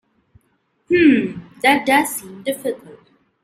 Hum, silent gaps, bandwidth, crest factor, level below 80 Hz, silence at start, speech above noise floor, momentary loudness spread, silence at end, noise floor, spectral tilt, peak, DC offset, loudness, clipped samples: none; none; 16 kHz; 18 dB; -58 dBFS; 0.9 s; 48 dB; 14 LU; 0.5 s; -65 dBFS; -4 dB/octave; -2 dBFS; under 0.1%; -17 LUFS; under 0.1%